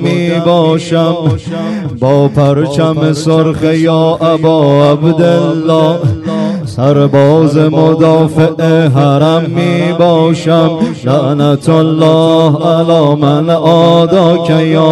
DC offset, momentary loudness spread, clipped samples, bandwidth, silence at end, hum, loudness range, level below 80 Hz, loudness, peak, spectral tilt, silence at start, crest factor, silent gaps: under 0.1%; 5 LU; 2%; 11.5 kHz; 0 s; none; 2 LU; -44 dBFS; -9 LUFS; 0 dBFS; -7.5 dB/octave; 0 s; 8 dB; none